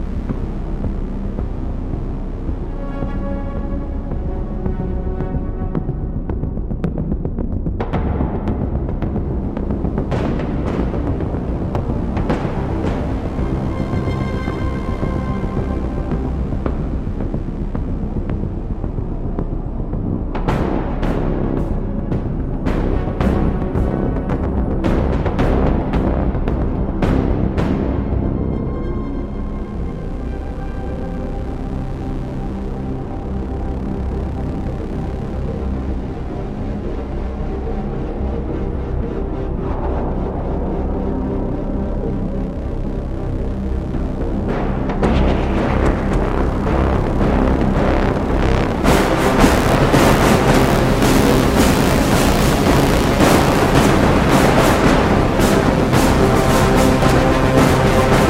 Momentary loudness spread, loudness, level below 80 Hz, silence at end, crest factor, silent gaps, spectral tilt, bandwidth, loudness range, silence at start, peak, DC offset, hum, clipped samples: 12 LU; -19 LUFS; -22 dBFS; 0 s; 18 dB; none; -6.5 dB/octave; 16.5 kHz; 11 LU; 0 s; 0 dBFS; under 0.1%; none; under 0.1%